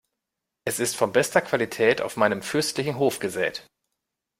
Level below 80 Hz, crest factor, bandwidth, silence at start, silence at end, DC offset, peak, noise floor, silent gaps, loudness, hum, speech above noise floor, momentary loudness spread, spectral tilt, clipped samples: -64 dBFS; 22 dB; 16 kHz; 0.65 s; 0.75 s; under 0.1%; -4 dBFS; -84 dBFS; none; -24 LUFS; none; 60 dB; 7 LU; -3.5 dB/octave; under 0.1%